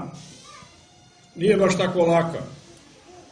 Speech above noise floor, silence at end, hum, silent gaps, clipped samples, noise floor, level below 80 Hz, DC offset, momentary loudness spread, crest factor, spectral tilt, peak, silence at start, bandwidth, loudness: 33 dB; 0.1 s; none; none; under 0.1%; -53 dBFS; -58 dBFS; under 0.1%; 23 LU; 18 dB; -6 dB/octave; -6 dBFS; 0 s; 10.5 kHz; -21 LUFS